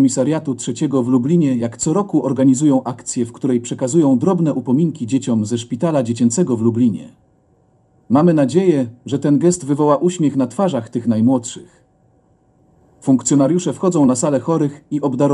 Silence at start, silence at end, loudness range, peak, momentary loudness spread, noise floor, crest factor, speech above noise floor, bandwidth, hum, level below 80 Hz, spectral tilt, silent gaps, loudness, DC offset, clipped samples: 0 s; 0 s; 3 LU; -2 dBFS; 7 LU; -56 dBFS; 16 dB; 40 dB; 11.5 kHz; none; -60 dBFS; -6.5 dB/octave; none; -17 LUFS; under 0.1%; under 0.1%